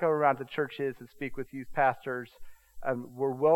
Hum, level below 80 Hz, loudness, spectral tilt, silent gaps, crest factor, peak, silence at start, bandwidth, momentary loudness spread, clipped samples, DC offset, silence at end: none; -58 dBFS; -32 LUFS; -7 dB/octave; none; 20 dB; -10 dBFS; 0 s; 16.5 kHz; 12 LU; under 0.1%; under 0.1%; 0 s